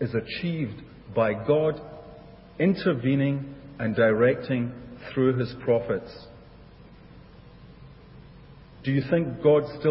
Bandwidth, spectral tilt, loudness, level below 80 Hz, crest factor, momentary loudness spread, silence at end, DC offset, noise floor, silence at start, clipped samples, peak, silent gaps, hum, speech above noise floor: 5.8 kHz; -11.5 dB/octave; -25 LUFS; -54 dBFS; 18 dB; 19 LU; 0 s; under 0.1%; -49 dBFS; 0 s; under 0.1%; -8 dBFS; none; none; 24 dB